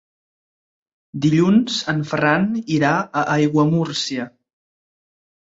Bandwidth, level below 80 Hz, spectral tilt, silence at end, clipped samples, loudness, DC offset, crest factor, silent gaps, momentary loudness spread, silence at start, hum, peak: 8 kHz; -58 dBFS; -5.5 dB/octave; 1.3 s; under 0.1%; -19 LUFS; under 0.1%; 18 dB; none; 8 LU; 1.15 s; none; -2 dBFS